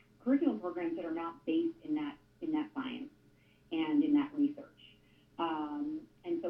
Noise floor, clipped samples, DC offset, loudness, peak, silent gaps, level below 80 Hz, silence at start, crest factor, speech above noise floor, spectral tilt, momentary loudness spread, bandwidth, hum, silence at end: -65 dBFS; under 0.1%; under 0.1%; -35 LUFS; -18 dBFS; none; -74 dBFS; 0.25 s; 18 dB; 31 dB; -7.5 dB/octave; 13 LU; 4.4 kHz; none; 0 s